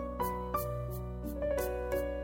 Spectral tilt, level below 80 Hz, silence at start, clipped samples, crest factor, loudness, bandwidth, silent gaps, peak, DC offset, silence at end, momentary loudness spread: -6.5 dB/octave; -44 dBFS; 0 s; under 0.1%; 14 dB; -36 LUFS; 16.5 kHz; none; -20 dBFS; under 0.1%; 0 s; 6 LU